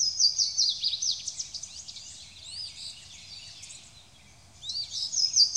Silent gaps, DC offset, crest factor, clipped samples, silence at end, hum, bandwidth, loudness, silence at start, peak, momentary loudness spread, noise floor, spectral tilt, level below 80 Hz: none; under 0.1%; 20 dB; under 0.1%; 0 s; none; 16 kHz; -26 LUFS; 0 s; -10 dBFS; 21 LU; -55 dBFS; 2.5 dB/octave; -64 dBFS